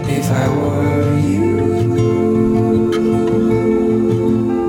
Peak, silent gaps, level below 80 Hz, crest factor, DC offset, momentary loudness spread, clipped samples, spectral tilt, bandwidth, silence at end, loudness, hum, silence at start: -2 dBFS; none; -38 dBFS; 12 dB; under 0.1%; 2 LU; under 0.1%; -8 dB/octave; 17.5 kHz; 0 s; -15 LUFS; none; 0 s